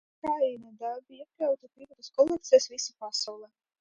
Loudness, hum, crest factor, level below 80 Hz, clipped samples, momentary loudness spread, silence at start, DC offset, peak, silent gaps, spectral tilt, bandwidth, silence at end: -29 LUFS; none; 22 dB; -72 dBFS; under 0.1%; 15 LU; 0.25 s; under 0.1%; -8 dBFS; none; -2 dB/octave; 9 kHz; 0.35 s